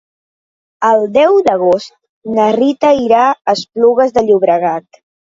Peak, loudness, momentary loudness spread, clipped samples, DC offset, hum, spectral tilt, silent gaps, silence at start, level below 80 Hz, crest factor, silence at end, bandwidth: 0 dBFS; -12 LUFS; 7 LU; under 0.1%; under 0.1%; none; -5.5 dB/octave; 2.09-2.22 s; 0.8 s; -54 dBFS; 12 dB; 0.6 s; 7.8 kHz